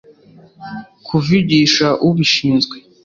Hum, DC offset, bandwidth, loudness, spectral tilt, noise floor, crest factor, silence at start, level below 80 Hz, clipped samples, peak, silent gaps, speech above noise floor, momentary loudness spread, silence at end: none; under 0.1%; 7.6 kHz; -14 LUFS; -5 dB/octave; -45 dBFS; 14 dB; 0.6 s; -50 dBFS; under 0.1%; -2 dBFS; none; 30 dB; 19 LU; 0.25 s